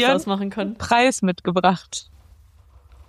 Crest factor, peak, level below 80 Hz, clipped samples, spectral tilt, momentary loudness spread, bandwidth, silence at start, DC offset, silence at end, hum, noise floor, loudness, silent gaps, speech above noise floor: 20 dB; -2 dBFS; -50 dBFS; under 0.1%; -4.5 dB/octave; 11 LU; 13.5 kHz; 0 s; under 0.1%; 1.05 s; none; -51 dBFS; -20 LUFS; none; 30 dB